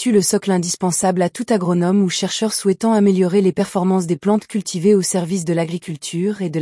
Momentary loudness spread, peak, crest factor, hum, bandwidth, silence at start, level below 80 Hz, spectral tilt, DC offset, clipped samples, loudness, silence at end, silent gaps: 6 LU; -4 dBFS; 14 dB; none; 12 kHz; 0 s; -62 dBFS; -5 dB/octave; under 0.1%; under 0.1%; -18 LUFS; 0 s; none